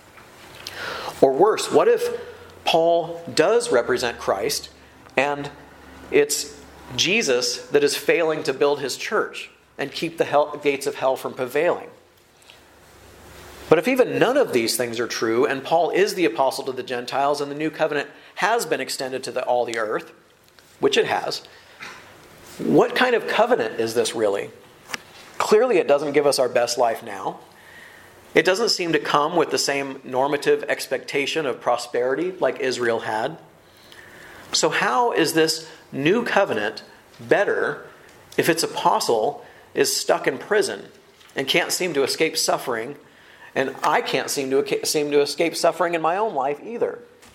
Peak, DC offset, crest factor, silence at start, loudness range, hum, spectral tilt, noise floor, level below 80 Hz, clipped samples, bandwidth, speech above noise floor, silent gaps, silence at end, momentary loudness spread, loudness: 0 dBFS; under 0.1%; 22 dB; 0.4 s; 4 LU; none; -3 dB/octave; -53 dBFS; -62 dBFS; under 0.1%; 16.5 kHz; 32 dB; none; 0.3 s; 12 LU; -21 LUFS